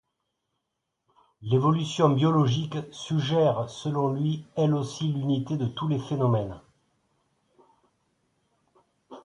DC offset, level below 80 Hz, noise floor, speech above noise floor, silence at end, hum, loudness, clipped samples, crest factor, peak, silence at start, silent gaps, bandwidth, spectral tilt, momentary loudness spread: under 0.1%; -62 dBFS; -82 dBFS; 56 dB; 0.05 s; none; -26 LUFS; under 0.1%; 20 dB; -6 dBFS; 1.4 s; none; 10.5 kHz; -7.5 dB/octave; 8 LU